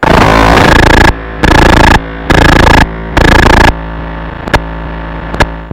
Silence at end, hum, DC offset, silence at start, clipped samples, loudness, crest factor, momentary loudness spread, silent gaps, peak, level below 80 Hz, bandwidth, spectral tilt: 0 s; none; 0.6%; 0 s; 7%; -6 LUFS; 6 dB; 16 LU; none; 0 dBFS; -12 dBFS; 17 kHz; -5.5 dB/octave